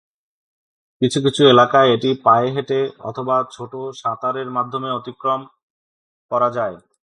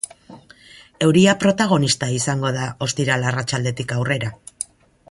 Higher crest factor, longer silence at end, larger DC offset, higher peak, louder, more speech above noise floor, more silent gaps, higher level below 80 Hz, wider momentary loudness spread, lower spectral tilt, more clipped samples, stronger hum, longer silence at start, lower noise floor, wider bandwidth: about the same, 20 dB vs 18 dB; about the same, 0.4 s vs 0.45 s; neither; about the same, 0 dBFS vs -2 dBFS; about the same, -18 LUFS vs -19 LUFS; first, over 72 dB vs 28 dB; first, 5.63-6.29 s vs none; second, -64 dBFS vs -54 dBFS; about the same, 14 LU vs 16 LU; about the same, -5.5 dB/octave vs -4.5 dB/octave; neither; neither; first, 1 s vs 0.3 s; first, under -90 dBFS vs -46 dBFS; about the same, 11 kHz vs 11.5 kHz